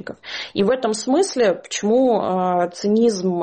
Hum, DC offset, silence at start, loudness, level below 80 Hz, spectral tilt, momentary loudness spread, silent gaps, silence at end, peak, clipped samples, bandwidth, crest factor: none; under 0.1%; 0.05 s; -19 LUFS; -60 dBFS; -5 dB/octave; 6 LU; none; 0 s; -8 dBFS; under 0.1%; 8.8 kHz; 12 dB